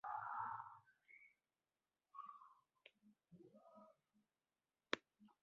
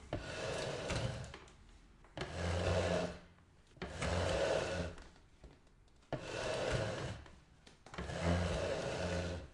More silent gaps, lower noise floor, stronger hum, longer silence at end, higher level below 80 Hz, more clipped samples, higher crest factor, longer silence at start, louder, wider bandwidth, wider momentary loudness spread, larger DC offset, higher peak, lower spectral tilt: neither; first, under -90 dBFS vs -65 dBFS; neither; about the same, 0.1 s vs 0 s; second, under -90 dBFS vs -54 dBFS; neither; first, 36 dB vs 18 dB; about the same, 0.05 s vs 0 s; second, -51 LUFS vs -39 LUFS; second, 5.4 kHz vs 11.5 kHz; first, 21 LU vs 16 LU; neither; about the same, -20 dBFS vs -22 dBFS; second, -0.5 dB/octave vs -5 dB/octave